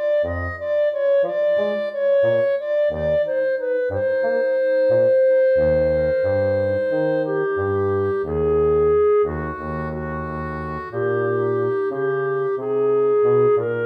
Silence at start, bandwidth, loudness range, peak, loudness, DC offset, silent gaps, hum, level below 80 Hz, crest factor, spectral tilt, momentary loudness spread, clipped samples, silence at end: 0 s; 5 kHz; 4 LU; -8 dBFS; -20 LUFS; under 0.1%; none; none; -42 dBFS; 12 dB; -9 dB/octave; 10 LU; under 0.1%; 0 s